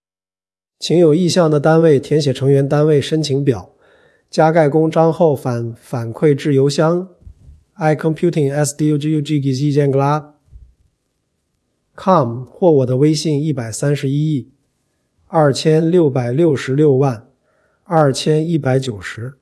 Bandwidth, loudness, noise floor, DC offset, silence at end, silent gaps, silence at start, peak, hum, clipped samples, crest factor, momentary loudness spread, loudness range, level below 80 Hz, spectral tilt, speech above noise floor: 12 kHz; -15 LUFS; under -90 dBFS; under 0.1%; 0.1 s; none; 0.8 s; 0 dBFS; none; under 0.1%; 16 dB; 10 LU; 4 LU; -56 dBFS; -6.5 dB/octave; over 76 dB